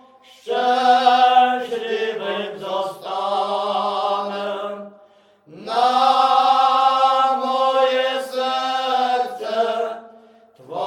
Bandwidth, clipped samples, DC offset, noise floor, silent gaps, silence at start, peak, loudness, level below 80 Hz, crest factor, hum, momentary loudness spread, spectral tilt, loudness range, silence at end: 13.5 kHz; under 0.1%; under 0.1%; -52 dBFS; none; 0.45 s; -2 dBFS; -19 LUFS; -78 dBFS; 18 dB; none; 12 LU; -3 dB/octave; 7 LU; 0 s